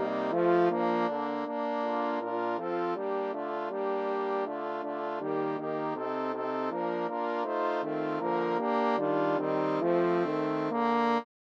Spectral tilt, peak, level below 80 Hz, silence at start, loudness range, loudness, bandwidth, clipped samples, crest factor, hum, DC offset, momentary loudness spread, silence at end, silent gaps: -7.5 dB/octave; -14 dBFS; under -90 dBFS; 0 s; 4 LU; -30 LUFS; 7 kHz; under 0.1%; 16 dB; none; under 0.1%; 6 LU; 0.2 s; none